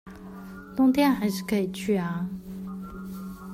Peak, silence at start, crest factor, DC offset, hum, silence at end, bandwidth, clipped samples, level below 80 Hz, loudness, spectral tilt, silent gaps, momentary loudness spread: -10 dBFS; 0.05 s; 16 dB; under 0.1%; none; 0 s; 16 kHz; under 0.1%; -54 dBFS; -26 LUFS; -6 dB/octave; none; 19 LU